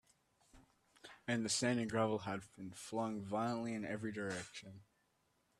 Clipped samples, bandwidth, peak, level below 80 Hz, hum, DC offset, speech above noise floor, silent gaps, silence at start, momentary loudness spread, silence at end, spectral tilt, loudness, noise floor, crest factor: under 0.1%; 13 kHz; -22 dBFS; -76 dBFS; none; under 0.1%; 39 dB; none; 0.55 s; 17 LU; 0.75 s; -4.5 dB/octave; -40 LUFS; -79 dBFS; 20 dB